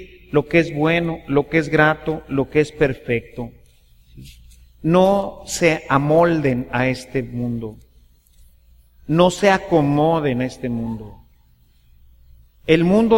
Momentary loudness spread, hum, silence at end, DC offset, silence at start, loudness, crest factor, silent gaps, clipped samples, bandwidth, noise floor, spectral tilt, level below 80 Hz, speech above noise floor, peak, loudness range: 11 LU; none; 0 s; under 0.1%; 0 s; -19 LUFS; 18 dB; none; under 0.1%; 16.5 kHz; -54 dBFS; -6 dB/octave; -44 dBFS; 36 dB; -2 dBFS; 3 LU